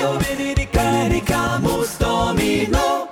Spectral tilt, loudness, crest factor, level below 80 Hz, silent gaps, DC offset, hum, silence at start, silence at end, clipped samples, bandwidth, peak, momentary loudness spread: -5 dB/octave; -19 LUFS; 12 dB; -30 dBFS; none; under 0.1%; none; 0 s; 0 s; under 0.1%; 16.5 kHz; -6 dBFS; 3 LU